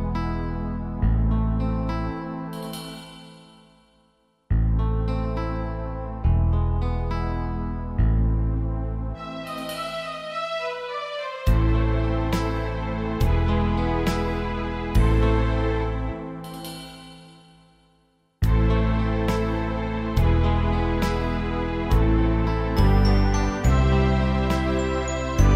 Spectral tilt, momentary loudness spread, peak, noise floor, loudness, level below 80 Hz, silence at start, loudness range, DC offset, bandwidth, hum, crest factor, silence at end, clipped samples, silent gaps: -7 dB/octave; 11 LU; -6 dBFS; -64 dBFS; -24 LUFS; -26 dBFS; 0 s; 7 LU; under 0.1%; 14.5 kHz; none; 18 dB; 0 s; under 0.1%; none